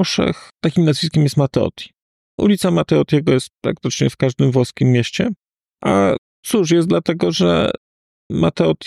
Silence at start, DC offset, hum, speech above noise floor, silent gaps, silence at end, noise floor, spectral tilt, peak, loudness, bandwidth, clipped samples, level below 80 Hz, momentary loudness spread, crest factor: 0 s; under 0.1%; none; over 74 dB; 2.02-2.38 s, 6.18-6.43 s, 7.77-8.30 s; 0 s; under -90 dBFS; -6 dB/octave; -4 dBFS; -17 LUFS; 13.5 kHz; under 0.1%; -46 dBFS; 9 LU; 14 dB